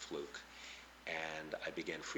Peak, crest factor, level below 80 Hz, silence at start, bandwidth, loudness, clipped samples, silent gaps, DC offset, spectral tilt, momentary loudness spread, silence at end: -26 dBFS; 20 dB; -70 dBFS; 0 s; 19 kHz; -45 LUFS; under 0.1%; none; under 0.1%; -3 dB/octave; 9 LU; 0 s